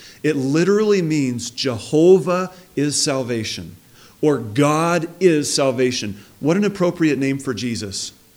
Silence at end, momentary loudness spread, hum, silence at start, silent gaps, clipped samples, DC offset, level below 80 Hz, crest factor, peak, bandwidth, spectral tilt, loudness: 0.25 s; 9 LU; none; 0 s; none; under 0.1%; under 0.1%; -58 dBFS; 16 dB; -2 dBFS; 17 kHz; -5 dB/octave; -19 LUFS